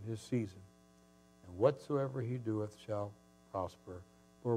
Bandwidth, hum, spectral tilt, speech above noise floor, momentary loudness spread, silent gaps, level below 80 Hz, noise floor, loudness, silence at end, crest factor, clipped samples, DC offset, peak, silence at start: 14 kHz; none; -8 dB/octave; 27 dB; 19 LU; none; -74 dBFS; -65 dBFS; -39 LUFS; 0 s; 24 dB; under 0.1%; under 0.1%; -16 dBFS; 0 s